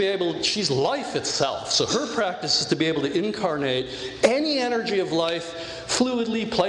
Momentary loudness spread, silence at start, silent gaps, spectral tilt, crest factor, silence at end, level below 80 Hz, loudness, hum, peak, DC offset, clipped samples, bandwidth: 5 LU; 0 s; none; -3.5 dB/octave; 20 dB; 0 s; -56 dBFS; -24 LUFS; none; -4 dBFS; under 0.1%; under 0.1%; 11.5 kHz